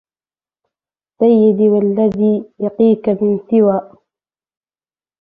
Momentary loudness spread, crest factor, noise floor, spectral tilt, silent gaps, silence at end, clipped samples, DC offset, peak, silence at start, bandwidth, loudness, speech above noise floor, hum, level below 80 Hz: 6 LU; 14 dB; under -90 dBFS; -11.5 dB/octave; none; 1.35 s; under 0.1%; under 0.1%; -2 dBFS; 1.2 s; 3.8 kHz; -14 LUFS; over 77 dB; none; -58 dBFS